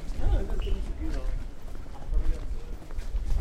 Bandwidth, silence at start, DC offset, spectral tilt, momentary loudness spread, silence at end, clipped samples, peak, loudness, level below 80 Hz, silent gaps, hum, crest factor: 8.6 kHz; 0 s; under 0.1%; -7 dB/octave; 12 LU; 0 s; under 0.1%; -14 dBFS; -35 LUFS; -28 dBFS; none; none; 14 dB